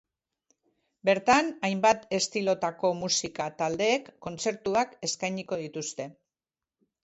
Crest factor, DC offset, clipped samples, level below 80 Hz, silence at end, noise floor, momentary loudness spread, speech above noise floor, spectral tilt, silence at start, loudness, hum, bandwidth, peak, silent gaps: 20 dB; under 0.1%; under 0.1%; -66 dBFS; 0.9 s; under -90 dBFS; 11 LU; over 62 dB; -3 dB/octave; 1.05 s; -28 LUFS; none; 8.2 kHz; -8 dBFS; none